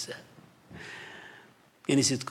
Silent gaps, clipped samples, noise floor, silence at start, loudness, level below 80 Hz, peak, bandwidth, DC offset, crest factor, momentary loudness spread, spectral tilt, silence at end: none; under 0.1%; -57 dBFS; 0 s; -29 LUFS; -74 dBFS; -14 dBFS; 15.5 kHz; under 0.1%; 20 dB; 23 LU; -3.5 dB/octave; 0 s